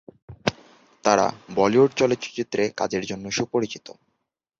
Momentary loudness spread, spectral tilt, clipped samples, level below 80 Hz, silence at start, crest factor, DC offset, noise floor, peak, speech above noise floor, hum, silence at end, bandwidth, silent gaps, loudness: 10 LU; -4.5 dB/octave; under 0.1%; -58 dBFS; 0.3 s; 20 dB; under 0.1%; -78 dBFS; -4 dBFS; 55 dB; none; 0.8 s; 7.6 kHz; none; -23 LUFS